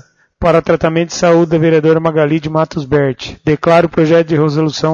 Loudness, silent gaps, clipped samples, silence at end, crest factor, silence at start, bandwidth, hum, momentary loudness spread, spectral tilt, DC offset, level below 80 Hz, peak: -12 LUFS; none; under 0.1%; 0 s; 12 dB; 0.4 s; 7.4 kHz; none; 6 LU; -6.5 dB/octave; under 0.1%; -38 dBFS; 0 dBFS